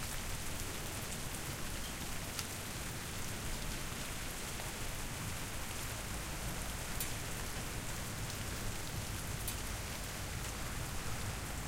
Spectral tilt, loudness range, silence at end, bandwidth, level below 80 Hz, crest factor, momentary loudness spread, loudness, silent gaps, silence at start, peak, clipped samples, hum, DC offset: -3 dB/octave; 1 LU; 0 s; 17 kHz; -46 dBFS; 24 dB; 2 LU; -41 LUFS; none; 0 s; -18 dBFS; under 0.1%; none; 0.1%